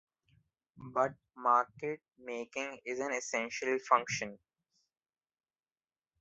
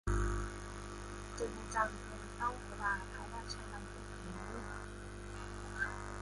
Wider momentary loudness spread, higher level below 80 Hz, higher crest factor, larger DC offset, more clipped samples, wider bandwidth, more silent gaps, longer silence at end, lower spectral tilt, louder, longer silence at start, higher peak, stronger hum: first, 14 LU vs 10 LU; second, -78 dBFS vs -46 dBFS; about the same, 26 dB vs 22 dB; neither; neither; second, 8 kHz vs 11.5 kHz; neither; first, 1.85 s vs 0 s; second, -2.5 dB/octave vs -4.5 dB/octave; first, -34 LUFS vs -42 LUFS; first, 0.75 s vs 0.05 s; first, -12 dBFS vs -18 dBFS; second, none vs 50 Hz at -50 dBFS